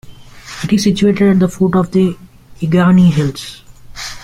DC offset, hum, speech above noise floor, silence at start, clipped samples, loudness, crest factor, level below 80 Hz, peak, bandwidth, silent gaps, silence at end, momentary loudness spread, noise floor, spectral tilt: under 0.1%; none; 22 dB; 0.05 s; under 0.1%; -13 LUFS; 12 dB; -40 dBFS; -2 dBFS; 12.5 kHz; none; 0 s; 18 LU; -33 dBFS; -7 dB/octave